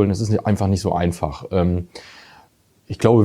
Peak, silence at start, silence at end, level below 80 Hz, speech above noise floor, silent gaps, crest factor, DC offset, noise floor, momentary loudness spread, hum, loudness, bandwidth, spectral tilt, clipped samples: 0 dBFS; 0 s; 0 s; -44 dBFS; 36 dB; none; 18 dB; under 0.1%; -55 dBFS; 17 LU; none; -20 LUFS; 13 kHz; -7.5 dB/octave; under 0.1%